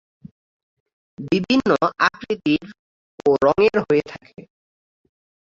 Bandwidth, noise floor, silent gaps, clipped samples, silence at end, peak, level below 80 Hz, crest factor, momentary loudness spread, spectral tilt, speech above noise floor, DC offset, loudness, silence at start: 7.4 kHz; under -90 dBFS; 2.79-3.18 s; under 0.1%; 1 s; -2 dBFS; -54 dBFS; 20 dB; 9 LU; -6 dB/octave; over 71 dB; under 0.1%; -19 LUFS; 1.2 s